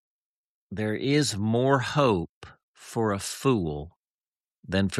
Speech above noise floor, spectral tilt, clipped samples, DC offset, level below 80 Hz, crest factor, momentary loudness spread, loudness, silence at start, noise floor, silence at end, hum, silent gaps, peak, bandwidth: over 64 dB; -5.5 dB/octave; under 0.1%; under 0.1%; -54 dBFS; 18 dB; 14 LU; -26 LUFS; 0.7 s; under -90 dBFS; 0 s; none; 2.29-2.41 s, 2.63-2.74 s, 3.96-4.00 s, 4.06-4.19 s, 4.26-4.63 s; -8 dBFS; 13.5 kHz